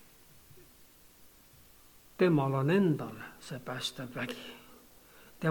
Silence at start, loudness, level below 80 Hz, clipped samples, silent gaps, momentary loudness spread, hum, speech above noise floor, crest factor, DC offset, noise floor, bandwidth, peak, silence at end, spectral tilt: 0.55 s; -32 LUFS; -68 dBFS; under 0.1%; none; 19 LU; none; 28 dB; 20 dB; under 0.1%; -59 dBFS; 19 kHz; -14 dBFS; 0 s; -6.5 dB/octave